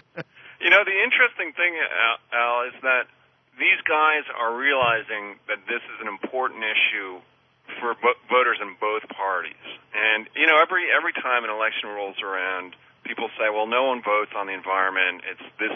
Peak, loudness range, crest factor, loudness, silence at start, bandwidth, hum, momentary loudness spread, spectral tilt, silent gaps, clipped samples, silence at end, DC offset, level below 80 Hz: -4 dBFS; 5 LU; 20 dB; -22 LUFS; 0.15 s; 6.2 kHz; none; 14 LU; -4.5 dB/octave; none; under 0.1%; 0 s; under 0.1%; -74 dBFS